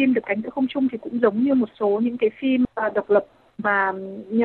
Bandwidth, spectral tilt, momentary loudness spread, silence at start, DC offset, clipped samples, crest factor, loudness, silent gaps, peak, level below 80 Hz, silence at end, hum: 4.3 kHz; -9 dB/octave; 6 LU; 0 s; under 0.1%; under 0.1%; 16 dB; -22 LUFS; none; -4 dBFS; -60 dBFS; 0 s; none